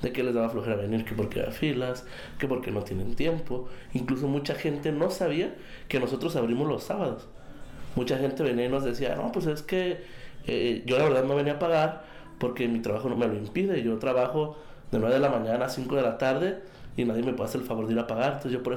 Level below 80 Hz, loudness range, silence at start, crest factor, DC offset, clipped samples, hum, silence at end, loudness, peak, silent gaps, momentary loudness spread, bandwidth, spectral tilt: -48 dBFS; 3 LU; 0 s; 14 dB; under 0.1%; under 0.1%; none; 0 s; -28 LUFS; -14 dBFS; none; 9 LU; 17.5 kHz; -6.5 dB/octave